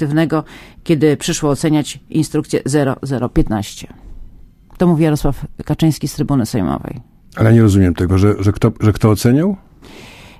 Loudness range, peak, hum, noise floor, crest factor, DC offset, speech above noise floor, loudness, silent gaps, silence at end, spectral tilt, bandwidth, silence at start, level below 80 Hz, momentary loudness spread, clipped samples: 4 LU; 0 dBFS; none; -40 dBFS; 16 dB; under 0.1%; 25 dB; -15 LUFS; none; 0.15 s; -6.5 dB/octave; 15.5 kHz; 0 s; -32 dBFS; 13 LU; under 0.1%